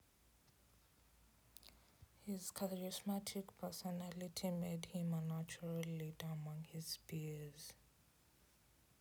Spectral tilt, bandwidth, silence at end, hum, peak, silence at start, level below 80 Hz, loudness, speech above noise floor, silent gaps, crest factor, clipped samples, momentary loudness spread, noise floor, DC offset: -5.5 dB/octave; over 20 kHz; 1.2 s; none; -30 dBFS; 0.75 s; -76 dBFS; -47 LUFS; 27 dB; none; 20 dB; under 0.1%; 13 LU; -73 dBFS; under 0.1%